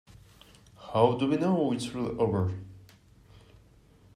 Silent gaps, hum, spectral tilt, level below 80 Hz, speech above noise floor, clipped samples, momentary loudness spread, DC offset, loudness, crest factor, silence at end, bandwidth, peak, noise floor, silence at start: none; none; -7 dB/octave; -60 dBFS; 31 dB; under 0.1%; 17 LU; under 0.1%; -28 LUFS; 22 dB; 1.35 s; 14 kHz; -8 dBFS; -58 dBFS; 0.8 s